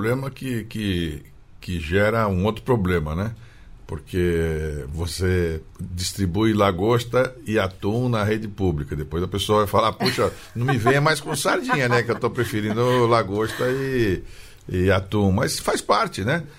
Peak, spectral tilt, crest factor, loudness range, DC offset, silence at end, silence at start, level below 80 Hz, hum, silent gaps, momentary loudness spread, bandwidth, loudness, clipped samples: -6 dBFS; -5.5 dB/octave; 16 dB; 4 LU; under 0.1%; 0.05 s; 0 s; -40 dBFS; none; none; 10 LU; 16 kHz; -22 LUFS; under 0.1%